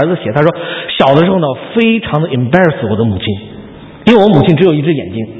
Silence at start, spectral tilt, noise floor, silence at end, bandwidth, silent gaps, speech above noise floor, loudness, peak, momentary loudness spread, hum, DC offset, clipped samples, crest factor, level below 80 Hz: 0 s; -8.5 dB/octave; -31 dBFS; 0 s; 8 kHz; none; 21 dB; -11 LUFS; 0 dBFS; 10 LU; none; under 0.1%; 0.5%; 10 dB; -40 dBFS